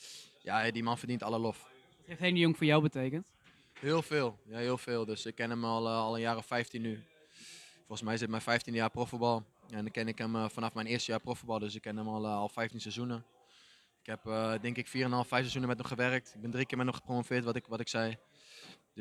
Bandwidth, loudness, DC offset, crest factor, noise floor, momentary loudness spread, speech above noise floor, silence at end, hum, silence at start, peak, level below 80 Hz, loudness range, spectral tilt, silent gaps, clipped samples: 13.5 kHz; -35 LUFS; under 0.1%; 24 dB; -64 dBFS; 14 LU; 30 dB; 0 s; none; 0 s; -12 dBFS; -72 dBFS; 5 LU; -5.5 dB/octave; none; under 0.1%